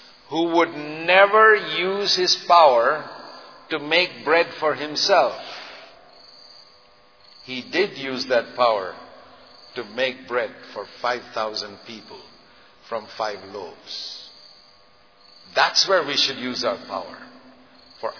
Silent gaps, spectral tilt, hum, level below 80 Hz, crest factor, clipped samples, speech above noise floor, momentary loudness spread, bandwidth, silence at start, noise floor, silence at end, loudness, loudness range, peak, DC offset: none; -2 dB/octave; none; -72 dBFS; 22 dB; under 0.1%; 34 dB; 21 LU; 5.4 kHz; 0.3 s; -55 dBFS; 0 s; -20 LUFS; 13 LU; 0 dBFS; under 0.1%